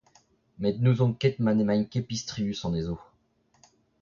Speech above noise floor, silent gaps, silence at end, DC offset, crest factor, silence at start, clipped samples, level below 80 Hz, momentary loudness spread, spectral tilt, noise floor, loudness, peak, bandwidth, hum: 41 dB; none; 1 s; under 0.1%; 18 dB; 0.6 s; under 0.1%; -54 dBFS; 9 LU; -7 dB/octave; -67 dBFS; -27 LUFS; -10 dBFS; 7.4 kHz; none